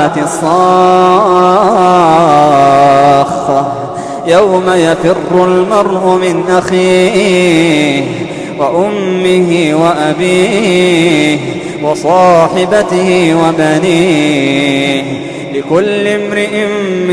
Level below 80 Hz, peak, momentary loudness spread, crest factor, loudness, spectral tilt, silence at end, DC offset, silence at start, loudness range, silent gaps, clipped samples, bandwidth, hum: -44 dBFS; 0 dBFS; 8 LU; 8 dB; -9 LUFS; -5.5 dB/octave; 0 s; under 0.1%; 0 s; 3 LU; none; 0.3%; 11 kHz; none